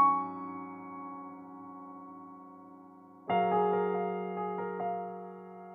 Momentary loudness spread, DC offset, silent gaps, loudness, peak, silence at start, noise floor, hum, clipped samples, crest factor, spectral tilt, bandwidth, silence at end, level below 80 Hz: 22 LU; under 0.1%; none; -33 LUFS; -14 dBFS; 0 s; -54 dBFS; none; under 0.1%; 20 dB; -9.5 dB/octave; 3.8 kHz; 0 s; -84 dBFS